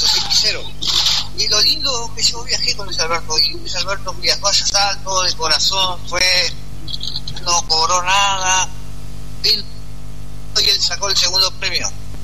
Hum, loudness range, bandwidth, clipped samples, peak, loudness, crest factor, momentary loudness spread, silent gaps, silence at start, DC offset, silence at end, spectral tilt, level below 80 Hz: 50 Hz at -35 dBFS; 2 LU; 13.5 kHz; under 0.1%; -2 dBFS; -15 LUFS; 16 dB; 13 LU; none; 0 s; 8%; 0 s; -0.5 dB/octave; -36 dBFS